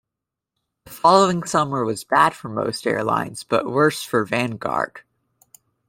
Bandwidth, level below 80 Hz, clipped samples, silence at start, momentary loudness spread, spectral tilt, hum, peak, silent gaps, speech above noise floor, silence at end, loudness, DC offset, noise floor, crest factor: 16.5 kHz; -60 dBFS; under 0.1%; 0.85 s; 8 LU; -4.5 dB/octave; none; -2 dBFS; none; 65 dB; 0.9 s; -20 LUFS; under 0.1%; -85 dBFS; 20 dB